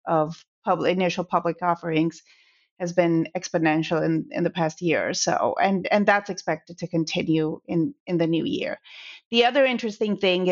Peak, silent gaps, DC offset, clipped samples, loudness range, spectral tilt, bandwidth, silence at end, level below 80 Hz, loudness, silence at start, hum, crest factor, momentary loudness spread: -4 dBFS; 0.48-0.62 s, 2.71-2.76 s, 8.00-8.06 s, 9.25-9.31 s; under 0.1%; under 0.1%; 2 LU; -4 dB/octave; 7.6 kHz; 0 s; -66 dBFS; -24 LUFS; 0.05 s; none; 18 dB; 8 LU